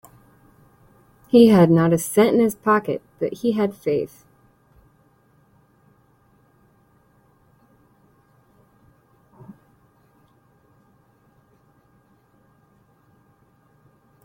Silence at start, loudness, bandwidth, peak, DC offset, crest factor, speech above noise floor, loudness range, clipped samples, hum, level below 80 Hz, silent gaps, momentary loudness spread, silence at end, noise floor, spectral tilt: 1.35 s; -18 LUFS; 16.5 kHz; -2 dBFS; under 0.1%; 22 dB; 42 dB; 13 LU; under 0.1%; none; -62 dBFS; none; 14 LU; 10.2 s; -59 dBFS; -6.5 dB/octave